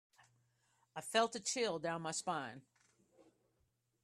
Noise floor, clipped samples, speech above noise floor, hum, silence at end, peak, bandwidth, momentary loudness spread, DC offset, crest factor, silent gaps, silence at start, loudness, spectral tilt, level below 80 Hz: -81 dBFS; under 0.1%; 42 dB; none; 1.45 s; -20 dBFS; 14 kHz; 15 LU; under 0.1%; 24 dB; none; 0.95 s; -39 LUFS; -2.5 dB/octave; -86 dBFS